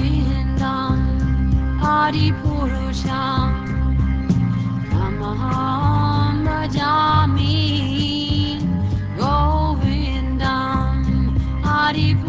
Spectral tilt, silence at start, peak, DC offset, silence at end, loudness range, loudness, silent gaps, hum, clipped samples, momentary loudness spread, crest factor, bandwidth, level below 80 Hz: -7 dB/octave; 0 s; -4 dBFS; 0.4%; 0 s; 2 LU; -19 LUFS; none; none; under 0.1%; 5 LU; 14 dB; 7.8 kHz; -24 dBFS